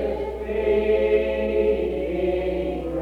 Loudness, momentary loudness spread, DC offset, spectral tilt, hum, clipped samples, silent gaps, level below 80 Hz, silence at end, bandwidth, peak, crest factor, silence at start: -23 LUFS; 7 LU; under 0.1%; -8 dB/octave; none; under 0.1%; none; -36 dBFS; 0 s; 5.2 kHz; -10 dBFS; 14 dB; 0 s